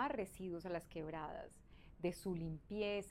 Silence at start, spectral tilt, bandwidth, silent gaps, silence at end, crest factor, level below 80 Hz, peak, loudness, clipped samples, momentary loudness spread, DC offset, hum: 0 s; -6 dB/octave; 16 kHz; none; 0 s; 16 dB; -64 dBFS; -28 dBFS; -45 LUFS; under 0.1%; 13 LU; under 0.1%; none